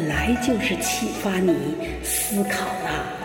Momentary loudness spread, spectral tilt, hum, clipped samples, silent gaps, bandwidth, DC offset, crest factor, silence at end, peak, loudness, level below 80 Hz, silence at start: 5 LU; -4 dB/octave; none; under 0.1%; none; 17 kHz; under 0.1%; 14 dB; 0 s; -8 dBFS; -23 LUFS; -40 dBFS; 0 s